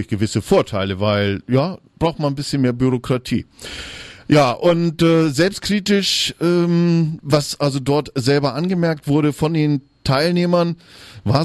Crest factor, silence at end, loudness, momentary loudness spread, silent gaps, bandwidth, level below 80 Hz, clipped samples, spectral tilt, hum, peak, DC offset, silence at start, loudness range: 16 dB; 0 s; -18 LUFS; 8 LU; none; 13 kHz; -46 dBFS; under 0.1%; -6 dB/octave; none; -2 dBFS; under 0.1%; 0 s; 3 LU